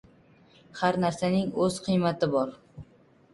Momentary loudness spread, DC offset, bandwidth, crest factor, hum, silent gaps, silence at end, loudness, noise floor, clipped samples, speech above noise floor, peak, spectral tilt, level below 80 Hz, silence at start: 8 LU; under 0.1%; 11.5 kHz; 18 dB; none; none; 0.5 s; -27 LUFS; -59 dBFS; under 0.1%; 32 dB; -10 dBFS; -6 dB/octave; -60 dBFS; 0.75 s